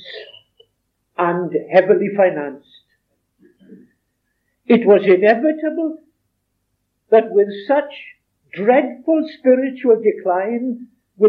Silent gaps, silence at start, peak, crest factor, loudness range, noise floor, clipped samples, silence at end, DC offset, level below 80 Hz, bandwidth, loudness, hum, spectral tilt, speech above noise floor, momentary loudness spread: none; 0.05 s; 0 dBFS; 18 dB; 4 LU; -71 dBFS; under 0.1%; 0 s; under 0.1%; -76 dBFS; 5.2 kHz; -16 LUFS; none; -9 dB/octave; 55 dB; 19 LU